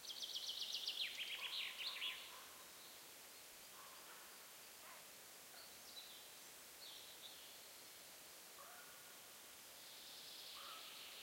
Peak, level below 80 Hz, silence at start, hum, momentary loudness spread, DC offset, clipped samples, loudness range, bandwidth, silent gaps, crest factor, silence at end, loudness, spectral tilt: -32 dBFS; under -90 dBFS; 0 s; none; 12 LU; under 0.1%; under 0.1%; 10 LU; 16.5 kHz; none; 22 dB; 0 s; -51 LUFS; 1 dB/octave